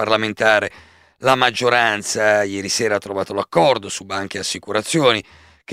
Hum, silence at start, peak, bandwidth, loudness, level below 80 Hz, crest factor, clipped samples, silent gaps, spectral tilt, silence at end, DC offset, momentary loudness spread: none; 0 s; 0 dBFS; 16 kHz; -18 LUFS; -58 dBFS; 18 dB; under 0.1%; none; -3 dB/octave; 0 s; under 0.1%; 9 LU